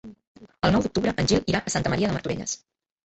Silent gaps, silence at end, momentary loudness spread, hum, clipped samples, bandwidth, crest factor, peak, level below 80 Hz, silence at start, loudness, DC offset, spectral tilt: 0.27-0.35 s; 0.5 s; 8 LU; none; under 0.1%; 8.4 kHz; 18 dB; -6 dBFS; -44 dBFS; 0.05 s; -25 LUFS; under 0.1%; -4.5 dB/octave